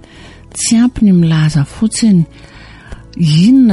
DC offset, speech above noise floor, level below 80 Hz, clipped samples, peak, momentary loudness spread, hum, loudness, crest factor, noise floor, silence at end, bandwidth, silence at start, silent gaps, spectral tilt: under 0.1%; 27 dB; -36 dBFS; under 0.1%; -2 dBFS; 10 LU; none; -11 LUFS; 10 dB; -36 dBFS; 0 s; 11.5 kHz; 0.55 s; none; -5.5 dB/octave